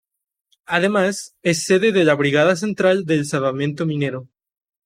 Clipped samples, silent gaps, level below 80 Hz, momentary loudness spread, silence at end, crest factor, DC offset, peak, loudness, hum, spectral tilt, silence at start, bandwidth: under 0.1%; none; -62 dBFS; 7 LU; 0.6 s; 18 dB; under 0.1%; -2 dBFS; -18 LUFS; none; -5 dB/octave; 0.7 s; 15.5 kHz